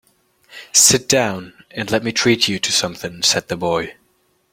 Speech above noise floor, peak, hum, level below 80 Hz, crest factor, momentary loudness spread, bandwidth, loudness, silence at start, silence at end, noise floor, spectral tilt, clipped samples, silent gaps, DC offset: 44 dB; 0 dBFS; none; -54 dBFS; 20 dB; 16 LU; 16.5 kHz; -16 LUFS; 0.5 s; 0.6 s; -62 dBFS; -2 dB/octave; under 0.1%; none; under 0.1%